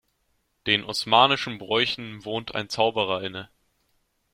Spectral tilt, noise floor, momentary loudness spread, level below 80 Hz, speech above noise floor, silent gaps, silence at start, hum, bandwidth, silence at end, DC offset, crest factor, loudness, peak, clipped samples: -3.5 dB/octave; -71 dBFS; 14 LU; -62 dBFS; 47 dB; none; 0.65 s; none; 16 kHz; 0.9 s; under 0.1%; 24 dB; -24 LUFS; -2 dBFS; under 0.1%